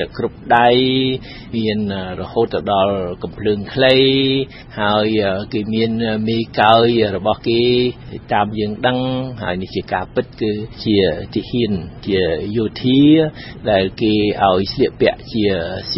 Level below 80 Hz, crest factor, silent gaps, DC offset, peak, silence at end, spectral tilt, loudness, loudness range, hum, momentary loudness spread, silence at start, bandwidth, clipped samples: -42 dBFS; 16 dB; none; under 0.1%; 0 dBFS; 0 s; -8.5 dB/octave; -17 LUFS; 4 LU; none; 11 LU; 0 s; 5.8 kHz; under 0.1%